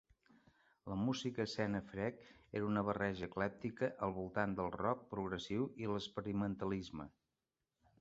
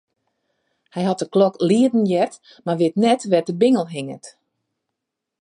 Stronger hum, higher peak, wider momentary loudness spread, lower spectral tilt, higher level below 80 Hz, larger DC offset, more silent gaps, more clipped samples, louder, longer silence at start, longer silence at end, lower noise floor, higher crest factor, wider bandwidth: neither; second, -20 dBFS vs -4 dBFS; second, 7 LU vs 14 LU; second, -5 dB/octave vs -6.5 dB/octave; about the same, -66 dBFS vs -70 dBFS; neither; neither; neither; second, -41 LUFS vs -19 LUFS; about the same, 0.85 s vs 0.95 s; second, 0.9 s vs 1.15 s; first, under -90 dBFS vs -81 dBFS; about the same, 22 dB vs 18 dB; second, 7.6 kHz vs 11.5 kHz